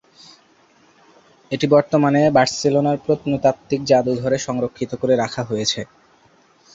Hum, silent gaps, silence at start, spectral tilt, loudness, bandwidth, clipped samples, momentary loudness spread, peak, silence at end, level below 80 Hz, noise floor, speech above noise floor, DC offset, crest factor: none; none; 1.5 s; -5.5 dB/octave; -19 LUFS; 8 kHz; under 0.1%; 9 LU; -2 dBFS; 0.9 s; -56 dBFS; -55 dBFS; 37 dB; under 0.1%; 18 dB